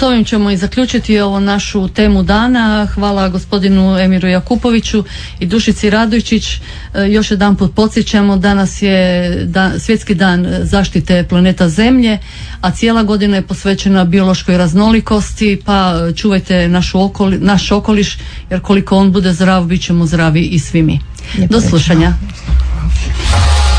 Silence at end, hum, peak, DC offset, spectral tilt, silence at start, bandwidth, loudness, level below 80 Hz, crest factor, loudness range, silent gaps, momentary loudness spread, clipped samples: 0 s; none; 0 dBFS; under 0.1%; -6 dB/octave; 0 s; 10.5 kHz; -11 LUFS; -22 dBFS; 10 dB; 1 LU; none; 6 LU; under 0.1%